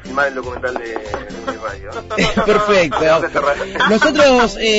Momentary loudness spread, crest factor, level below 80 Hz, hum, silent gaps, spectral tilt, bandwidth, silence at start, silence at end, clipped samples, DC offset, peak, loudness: 15 LU; 12 dB; -36 dBFS; none; none; -4 dB/octave; 8 kHz; 0 s; 0 s; under 0.1%; under 0.1%; -2 dBFS; -15 LUFS